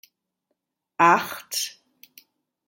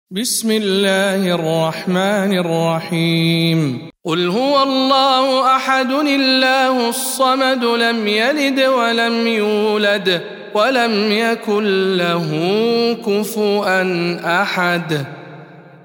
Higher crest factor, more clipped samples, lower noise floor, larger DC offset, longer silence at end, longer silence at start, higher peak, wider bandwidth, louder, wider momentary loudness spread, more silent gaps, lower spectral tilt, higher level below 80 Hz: first, 24 dB vs 14 dB; neither; first, -79 dBFS vs -38 dBFS; neither; first, 1 s vs 0.15 s; first, 1 s vs 0.1 s; about the same, -2 dBFS vs -2 dBFS; about the same, 17 kHz vs 17.5 kHz; second, -22 LUFS vs -16 LUFS; first, 14 LU vs 5 LU; neither; second, -2.5 dB/octave vs -4.5 dB/octave; second, -78 dBFS vs -68 dBFS